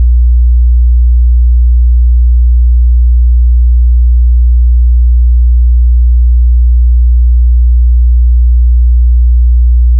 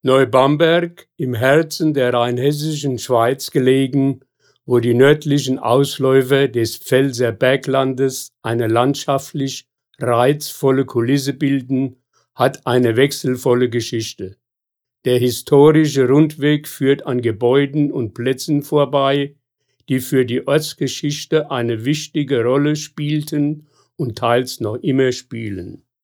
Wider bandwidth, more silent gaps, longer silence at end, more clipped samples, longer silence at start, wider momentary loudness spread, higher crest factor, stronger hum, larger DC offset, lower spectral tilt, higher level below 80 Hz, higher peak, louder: second, 0.1 kHz vs over 20 kHz; neither; second, 0 s vs 0.3 s; neither; about the same, 0 s vs 0.05 s; second, 0 LU vs 10 LU; second, 4 dB vs 16 dB; neither; neither; first, -14.5 dB/octave vs -6 dB/octave; first, -4 dBFS vs -62 dBFS; about the same, -2 dBFS vs -2 dBFS; first, -9 LUFS vs -17 LUFS